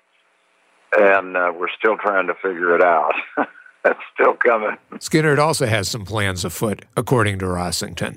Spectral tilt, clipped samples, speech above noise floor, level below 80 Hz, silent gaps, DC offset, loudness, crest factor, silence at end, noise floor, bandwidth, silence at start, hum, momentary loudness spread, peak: -4.5 dB/octave; under 0.1%; 42 dB; -52 dBFS; none; under 0.1%; -19 LUFS; 16 dB; 0 s; -61 dBFS; 16 kHz; 0.9 s; none; 8 LU; -2 dBFS